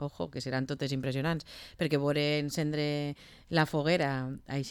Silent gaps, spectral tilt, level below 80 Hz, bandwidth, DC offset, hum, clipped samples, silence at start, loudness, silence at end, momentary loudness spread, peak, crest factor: none; -6 dB/octave; -60 dBFS; 18 kHz; under 0.1%; none; under 0.1%; 0 s; -32 LUFS; 0 s; 9 LU; -16 dBFS; 16 dB